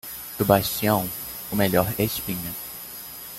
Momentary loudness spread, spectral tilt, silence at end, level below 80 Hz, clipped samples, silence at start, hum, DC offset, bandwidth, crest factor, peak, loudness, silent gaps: 14 LU; -5 dB/octave; 0 s; -50 dBFS; under 0.1%; 0.05 s; none; under 0.1%; 17 kHz; 22 dB; -2 dBFS; -24 LUFS; none